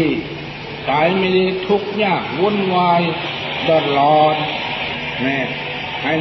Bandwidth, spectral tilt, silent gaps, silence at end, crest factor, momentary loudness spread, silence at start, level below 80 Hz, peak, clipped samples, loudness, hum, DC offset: 6 kHz; -7 dB/octave; none; 0 s; 14 dB; 9 LU; 0 s; -48 dBFS; -2 dBFS; under 0.1%; -17 LUFS; none; under 0.1%